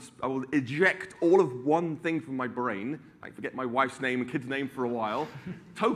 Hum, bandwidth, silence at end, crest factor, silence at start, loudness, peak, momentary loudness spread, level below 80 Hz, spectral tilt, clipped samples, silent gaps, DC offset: none; 11.5 kHz; 0 s; 20 dB; 0 s; -29 LUFS; -10 dBFS; 14 LU; -70 dBFS; -6.5 dB/octave; under 0.1%; none; under 0.1%